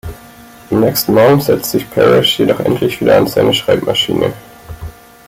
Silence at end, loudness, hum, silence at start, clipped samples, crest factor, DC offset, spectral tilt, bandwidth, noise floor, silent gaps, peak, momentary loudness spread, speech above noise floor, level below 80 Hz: 0.35 s; -12 LUFS; none; 0.05 s; under 0.1%; 12 dB; under 0.1%; -5 dB/octave; 17 kHz; -37 dBFS; none; 0 dBFS; 21 LU; 26 dB; -40 dBFS